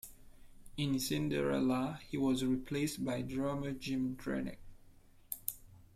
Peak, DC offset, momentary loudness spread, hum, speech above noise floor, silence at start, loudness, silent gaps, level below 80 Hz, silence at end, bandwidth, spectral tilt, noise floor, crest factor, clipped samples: -16 dBFS; under 0.1%; 10 LU; none; 25 dB; 0.05 s; -37 LUFS; none; -58 dBFS; 0.15 s; 16 kHz; -5.5 dB/octave; -60 dBFS; 20 dB; under 0.1%